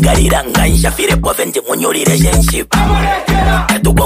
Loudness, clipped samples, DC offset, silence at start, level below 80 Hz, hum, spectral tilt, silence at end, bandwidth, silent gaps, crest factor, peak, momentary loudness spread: -12 LUFS; under 0.1%; under 0.1%; 0 s; -16 dBFS; none; -4.5 dB/octave; 0 s; 15.5 kHz; none; 10 dB; 0 dBFS; 4 LU